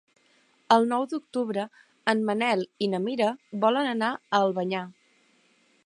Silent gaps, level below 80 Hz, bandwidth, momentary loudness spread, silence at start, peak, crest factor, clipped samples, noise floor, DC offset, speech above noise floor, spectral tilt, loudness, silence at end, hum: none; -80 dBFS; 11 kHz; 8 LU; 0.7 s; -6 dBFS; 22 dB; under 0.1%; -64 dBFS; under 0.1%; 39 dB; -5.5 dB/octave; -26 LUFS; 0.95 s; none